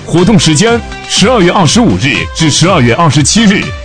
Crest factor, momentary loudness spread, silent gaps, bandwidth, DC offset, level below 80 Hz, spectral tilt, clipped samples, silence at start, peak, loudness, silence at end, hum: 8 dB; 4 LU; none; 10.5 kHz; 1%; -28 dBFS; -4.5 dB/octave; 0.6%; 0 s; 0 dBFS; -7 LUFS; 0 s; none